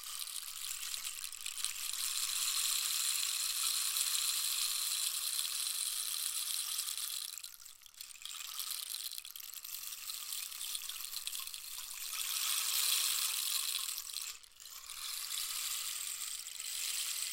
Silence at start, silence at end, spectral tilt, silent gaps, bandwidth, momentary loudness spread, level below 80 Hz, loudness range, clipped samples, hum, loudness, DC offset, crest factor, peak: 0 s; 0 s; 5 dB/octave; none; 17 kHz; 11 LU; -74 dBFS; 8 LU; under 0.1%; none; -35 LUFS; under 0.1%; 26 dB; -14 dBFS